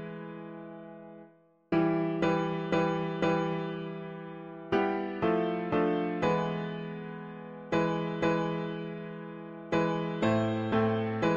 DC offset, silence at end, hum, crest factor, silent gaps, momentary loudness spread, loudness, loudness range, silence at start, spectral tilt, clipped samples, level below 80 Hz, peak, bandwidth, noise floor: under 0.1%; 0 s; none; 16 dB; none; 15 LU; -31 LUFS; 2 LU; 0 s; -7.5 dB/octave; under 0.1%; -60 dBFS; -14 dBFS; 7.4 kHz; -59 dBFS